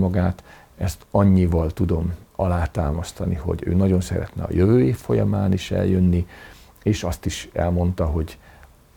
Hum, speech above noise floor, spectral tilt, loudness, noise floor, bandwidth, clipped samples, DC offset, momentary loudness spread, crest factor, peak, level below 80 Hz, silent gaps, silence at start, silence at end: none; 28 dB; -7.5 dB/octave; -22 LUFS; -48 dBFS; 17 kHz; under 0.1%; under 0.1%; 10 LU; 16 dB; -6 dBFS; -36 dBFS; none; 0 s; 0.6 s